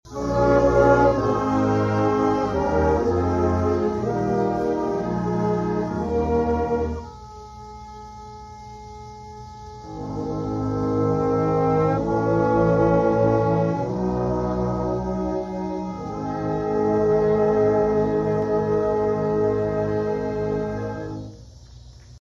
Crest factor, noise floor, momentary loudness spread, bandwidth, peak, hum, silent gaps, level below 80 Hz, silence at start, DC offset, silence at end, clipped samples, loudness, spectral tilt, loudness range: 18 dB; -44 dBFS; 20 LU; 7.6 kHz; -4 dBFS; 60 Hz at -45 dBFS; none; -38 dBFS; 0.05 s; under 0.1%; 0.1 s; under 0.1%; -22 LUFS; -8.5 dB/octave; 8 LU